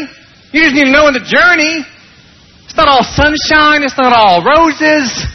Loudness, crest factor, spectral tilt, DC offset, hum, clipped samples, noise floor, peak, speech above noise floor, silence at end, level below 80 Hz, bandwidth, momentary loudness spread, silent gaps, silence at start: -8 LUFS; 10 dB; -3.5 dB/octave; under 0.1%; none; under 0.1%; -41 dBFS; 0 dBFS; 33 dB; 0 s; -32 dBFS; 6.4 kHz; 6 LU; none; 0 s